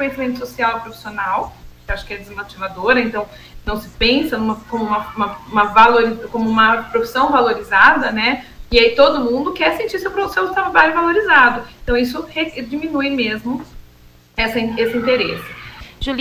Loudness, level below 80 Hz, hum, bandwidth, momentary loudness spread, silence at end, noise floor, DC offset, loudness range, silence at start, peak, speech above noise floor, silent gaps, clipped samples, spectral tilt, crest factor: -16 LUFS; -38 dBFS; 60 Hz at -45 dBFS; 16 kHz; 16 LU; 0 s; -46 dBFS; under 0.1%; 7 LU; 0 s; 0 dBFS; 30 dB; none; under 0.1%; -5 dB/octave; 16 dB